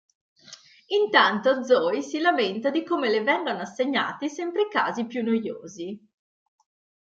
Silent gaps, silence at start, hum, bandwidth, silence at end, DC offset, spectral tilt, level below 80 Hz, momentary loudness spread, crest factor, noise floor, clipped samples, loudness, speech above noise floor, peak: none; 0.5 s; none; 7.8 kHz; 1.05 s; under 0.1%; -4 dB/octave; -78 dBFS; 14 LU; 22 dB; -50 dBFS; under 0.1%; -24 LUFS; 26 dB; -4 dBFS